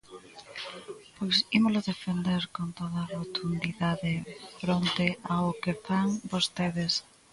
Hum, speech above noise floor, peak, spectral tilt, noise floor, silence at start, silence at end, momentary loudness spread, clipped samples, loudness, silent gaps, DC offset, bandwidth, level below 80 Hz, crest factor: none; 20 dB; -10 dBFS; -5 dB/octave; -49 dBFS; 0.1 s; 0.3 s; 15 LU; under 0.1%; -29 LUFS; none; under 0.1%; 11.5 kHz; -60 dBFS; 20 dB